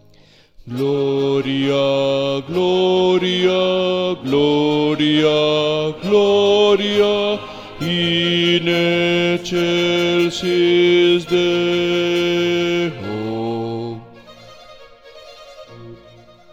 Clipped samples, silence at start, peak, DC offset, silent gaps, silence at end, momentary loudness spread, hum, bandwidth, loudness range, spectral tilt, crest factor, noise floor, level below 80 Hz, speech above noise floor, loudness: under 0.1%; 0.65 s; -2 dBFS; under 0.1%; none; 0.6 s; 9 LU; none; 8.8 kHz; 7 LU; -5.5 dB/octave; 14 dB; -49 dBFS; -54 dBFS; 33 dB; -17 LUFS